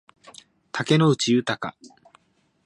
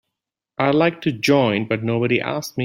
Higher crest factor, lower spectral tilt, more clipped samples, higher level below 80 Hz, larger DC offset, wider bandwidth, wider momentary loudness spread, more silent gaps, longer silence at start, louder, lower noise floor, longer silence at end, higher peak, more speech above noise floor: about the same, 20 dB vs 18 dB; about the same, -5.5 dB/octave vs -6 dB/octave; neither; second, -66 dBFS vs -60 dBFS; neither; second, 11.5 kHz vs 16 kHz; first, 14 LU vs 5 LU; neither; first, 0.75 s vs 0.6 s; second, -22 LUFS vs -19 LUFS; second, -64 dBFS vs -83 dBFS; first, 0.8 s vs 0 s; second, -6 dBFS vs -2 dBFS; second, 42 dB vs 64 dB